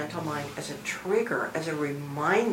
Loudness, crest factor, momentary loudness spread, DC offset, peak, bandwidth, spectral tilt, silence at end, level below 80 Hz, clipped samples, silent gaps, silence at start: -30 LUFS; 18 dB; 8 LU; under 0.1%; -10 dBFS; 16 kHz; -5 dB/octave; 0 s; -66 dBFS; under 0.1%; none; 0 s